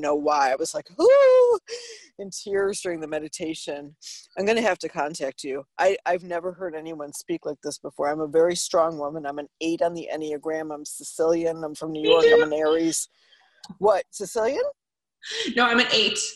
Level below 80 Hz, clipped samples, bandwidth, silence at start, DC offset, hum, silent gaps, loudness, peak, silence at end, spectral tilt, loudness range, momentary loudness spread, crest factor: -64 dBFS; under 0.1%; 12.5 kHz; 0 s; under 0.1%; none; none; -23 LUFS; -4 dBFS; 0 s; -2.5 dB/octave; 6 LU; 16 LU; 20 dB